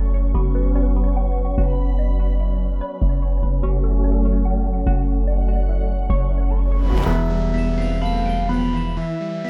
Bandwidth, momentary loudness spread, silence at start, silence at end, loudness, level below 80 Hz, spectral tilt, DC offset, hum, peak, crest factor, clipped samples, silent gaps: 4.4 kHz; 3 LU; 0 s; 0 s; -21 LUFS; -18 dBFS; -9 dB/octave; under 0.1%; none; -6 dBFS; 10 dB; under 0.1%; none